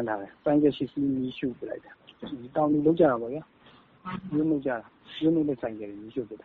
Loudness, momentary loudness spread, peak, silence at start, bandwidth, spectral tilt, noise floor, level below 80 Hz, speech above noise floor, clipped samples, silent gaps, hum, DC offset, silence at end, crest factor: -27 LUFS; 16 LU; -8 dBFS; 0 s; 4.5 kHz; -6.5 dB/octave; -55 dBFS; -62 dBFS; 28 dB; under 0.1%; none; none; under 0.1%; 0.1 s; 20 dB